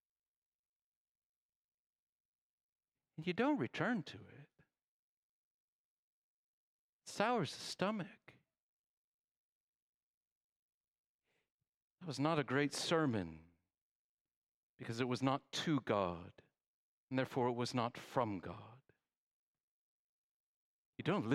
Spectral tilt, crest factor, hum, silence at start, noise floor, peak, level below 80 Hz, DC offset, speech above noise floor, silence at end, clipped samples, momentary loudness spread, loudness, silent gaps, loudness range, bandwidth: -5.5 dB/octave; 24 dB; none; 3.2 s; under -90 dBFS; -20 dBFS; -82 dBFS; under 0.1%; over 51 dB; 0 s; under 0.1%; 16 LU; -39 LUFS; 4.82-7.00 s, 8.62-11.19 s, 11.50-11.59 s, 11.67-11.97 s, 13.81-14.25 s, 14.36-14.77 s, 16.66-17.08 s, 19.16-20.93 s; 8 LU; 15 kHz